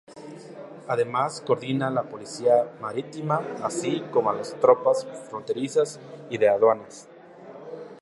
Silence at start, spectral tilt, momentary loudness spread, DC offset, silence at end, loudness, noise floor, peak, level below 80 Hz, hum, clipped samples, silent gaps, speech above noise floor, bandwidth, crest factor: 0.1 s; -5.5 dB/octave; 21 LU; under 0.1%; 0 s; -25 LUFS; -45 dBFS; -4 dBFS; -74 dBFS; none; under 0.1%; none; 20 dB; 11.5 kHz; 22 dB